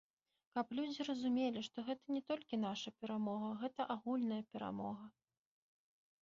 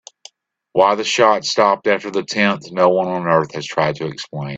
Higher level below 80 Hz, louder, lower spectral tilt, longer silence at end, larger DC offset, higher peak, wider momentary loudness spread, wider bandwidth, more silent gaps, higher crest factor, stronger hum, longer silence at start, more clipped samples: second, -82 dBFS vs -60 dBFS; second, -42 LUFS vs -17 LUFS; about the same, -4.5 dB/octave vs -4.5 dB/octave; first, 1.15 s vs 0 s; neither; second, -26 dBFS vs 0 dBFS; about the same, 7 LU vs 8 LU; second, 7.4 kHz vs 8.2 kHz; neither; about the same, 18 dB vs 18 dB; neither; second, 0.55 s vs 0.75 s; neither